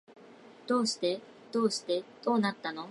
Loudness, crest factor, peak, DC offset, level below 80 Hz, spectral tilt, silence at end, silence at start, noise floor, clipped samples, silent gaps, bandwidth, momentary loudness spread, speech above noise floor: -31 LUFS; 18 dB; -14 dBFS; under 0.1%; -86 dBFS; -4 dB/octave; 0 s; 0.1 s; -54 dBFS; under 0.1%; none; 11.5 kHz; 9 LU; 23 dB